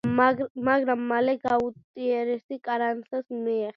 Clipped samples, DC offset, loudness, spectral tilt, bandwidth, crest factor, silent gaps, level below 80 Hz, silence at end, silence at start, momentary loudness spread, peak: under 0.1%; under 0.1%; -26 LUFS; -8 dB/octave; 7 kHz; 20 dB; 0.50-0.55 s, 1.84-1.94 s, 2.44-2.49 s; -64 dBFS; 0.05 s; 0.05 s; 9 LU; -6 dBFS